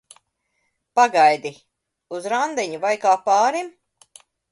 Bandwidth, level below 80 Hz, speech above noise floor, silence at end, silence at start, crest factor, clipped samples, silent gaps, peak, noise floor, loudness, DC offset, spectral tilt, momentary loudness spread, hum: 11.5 kHz; -74 dBFS; 53 dB; 0.85 s; 0.95 s; 18 dB; under 0.1%; none; -4 dBFS; -72 dBFS; -19 LUFS; under 0.1%; -2.5 dB/octave; 17 LU; none